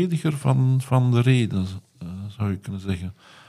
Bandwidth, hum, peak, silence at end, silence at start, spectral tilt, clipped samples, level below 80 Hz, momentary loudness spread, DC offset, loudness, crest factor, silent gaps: 12 kHz; none; -6 dBFS; 0.35 s; 0 s; -7.5 dB/octave; under 0.1%; -54 dBFS; 16 LU; under 0.1%; -23 LUFS; 18 dB; none